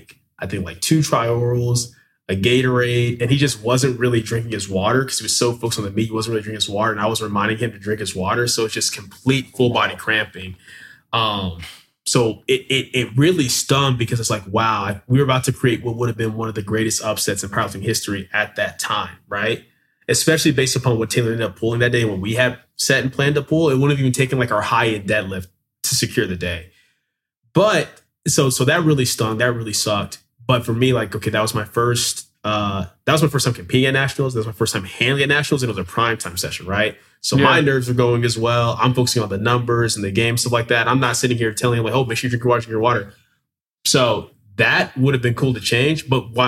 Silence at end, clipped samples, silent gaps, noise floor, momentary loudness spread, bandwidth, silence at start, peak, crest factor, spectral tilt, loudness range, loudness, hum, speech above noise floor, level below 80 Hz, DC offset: 0 s; under 0.1%; 43.70-43.78 s; -75 dBFS; 8 LU; 16 kHz; 0.4 s; 0 dBFS; 18 dB; -4.5 dB/octave; 3 LU; -19 LUFS; none; 56 dB; -50 dBFS; under 0.1%